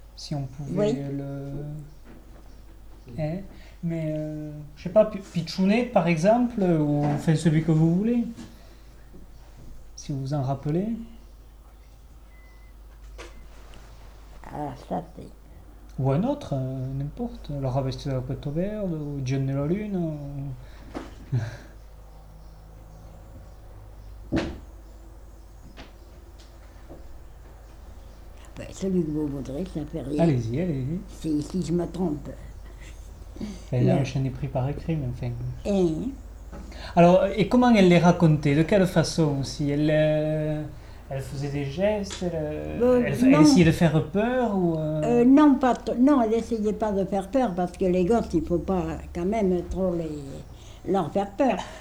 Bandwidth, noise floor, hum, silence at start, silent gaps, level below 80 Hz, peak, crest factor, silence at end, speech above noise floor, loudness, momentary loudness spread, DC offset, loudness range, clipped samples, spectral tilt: 13.5 kHz; -48 dBFS; none; 0 s; none; -44 dBFS; -6 dBFS; 20 dB; 0 s; 24 dB; -24 LUFS; 21 LU; under 0.1%; 17 LU; under 0.1%; -7.5 dB/octave